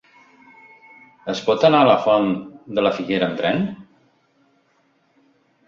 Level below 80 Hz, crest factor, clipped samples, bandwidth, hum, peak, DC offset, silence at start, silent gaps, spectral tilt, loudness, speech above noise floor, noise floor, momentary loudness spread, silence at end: -60 dBFS; 20 dB; under 0.1%; 7.4 kHz; none; -2 dBFS; under 0.1%; 1.25 s; none; -6 dB/octave; -19 LUFS; 45 dB; -62 dBFS; 14 LU; 1.85 s